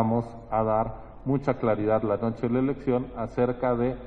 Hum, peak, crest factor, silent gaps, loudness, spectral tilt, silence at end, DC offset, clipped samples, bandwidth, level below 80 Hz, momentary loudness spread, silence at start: none; -8 dBFS; 18 dB; none; -27 LUFS; -10 dB/octave; 0 s; under 0.1%; under 0.1%; 6.4 kHz; -48 dBFS; 5 LU; 0 s